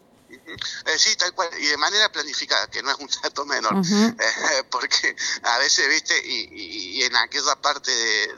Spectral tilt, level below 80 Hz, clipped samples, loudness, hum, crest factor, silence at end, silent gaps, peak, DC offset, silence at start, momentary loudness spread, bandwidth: -1.5 dB/octave; -66 dBFS; under 0.1%; -20 LUFS; none; 20 dB; 0 s; none; -2 dBFS; under 0.1%; 0.3 s; 9 LU; 12.5 kHz